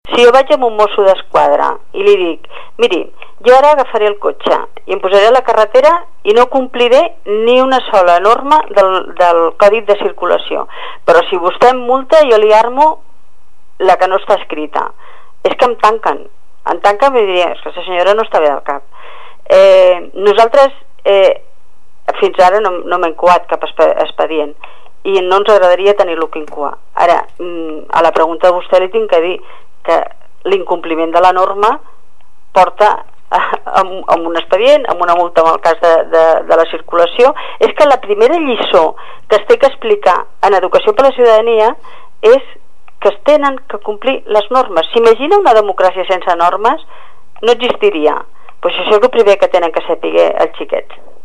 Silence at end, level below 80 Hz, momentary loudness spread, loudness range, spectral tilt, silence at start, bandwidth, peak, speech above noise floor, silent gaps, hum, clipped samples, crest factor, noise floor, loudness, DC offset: 0.4 s; -50 dBFS; 11 LU; 4 LU; -4 dB/octave; 0 s; 11.5 kHz; 0 dBFS; 44 dB; none; none; 0.5%; 12 dB; -54 dBFS; -10 LUFS; 7%